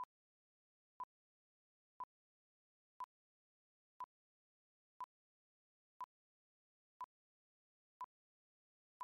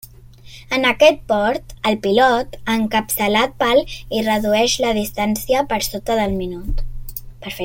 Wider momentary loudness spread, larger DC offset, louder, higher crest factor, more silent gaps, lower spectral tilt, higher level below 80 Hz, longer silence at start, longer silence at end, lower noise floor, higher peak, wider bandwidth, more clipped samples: second, 1 LU vs 15 LU; neither; second, -56 LUFS vs -18 LUFS; about the same, 18 dB vs 16 dB; first, 0.05-9.00 s vs none; second, 8.5 dB/octave vs -3.5 dB/octave; second, under -90 dBFS vs -34 dBFS; about the same, 0 s vs 0.05 s; about the same, 0 s vs 0 s; first, under -90 dBFS vs -41 dBFS; second, -42 dBFS vs -2 dBFS; second, 1.3 kHz vs 17 kHz; neither